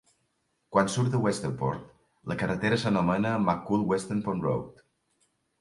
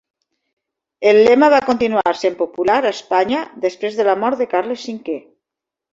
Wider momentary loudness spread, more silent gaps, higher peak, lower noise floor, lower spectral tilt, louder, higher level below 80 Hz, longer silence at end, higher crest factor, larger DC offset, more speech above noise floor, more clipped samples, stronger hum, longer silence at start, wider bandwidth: second, 8 LU vs 14 LU; neither; second, -8 dBFS vs -2 dBFS; second, -75 dBFS vs -85 dBFS; first, -6 dB/octave vs -4.5 dB/octave; second, -28 LUFS vs -16 LUFS; about the same, -58 dBFS vs -58 dBFS; first, 0.9 s vs 0.75 s; first, 22 dB vs 16 dB; neither; second, 48 dB vs 69 dB; neither; neither; second, 0.7 s vs 1 s; first, 11.5 kHz vs 7.8 kHz